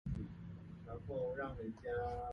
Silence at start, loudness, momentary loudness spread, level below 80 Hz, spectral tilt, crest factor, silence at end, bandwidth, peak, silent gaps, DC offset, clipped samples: 0.05 s; -45 LUFS; 11 LU; -54 dBFS; -9 dB/octave; 14 dB; 0 s; 7 kHz; -30 dBFS; none; under 0.1%; under 0.1%